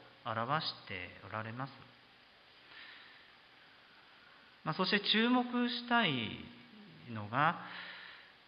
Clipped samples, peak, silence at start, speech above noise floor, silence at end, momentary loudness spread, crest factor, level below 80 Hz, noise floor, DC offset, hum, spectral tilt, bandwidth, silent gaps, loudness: under 0.1%; -16 dBFS; 0 s; 27 dB; 0.2 s; 24 LU; 22 dB; -74 dBFS; -62 dBFS; under 0.1%; none; -7.5 dB/octave; 5.4 kHz; none; -35 LUFS